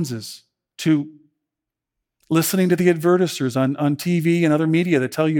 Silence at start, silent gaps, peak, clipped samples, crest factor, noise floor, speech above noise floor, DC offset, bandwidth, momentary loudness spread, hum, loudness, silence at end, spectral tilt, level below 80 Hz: 0 s; none; -4 dBFS; under 0.1%; 16 dB; -85 dBFS; 66 dB; under 0.1%; 19 kHz; 9 LU; none; -19 LUFS; 0 s; -6 dB/octave; -68 dBFS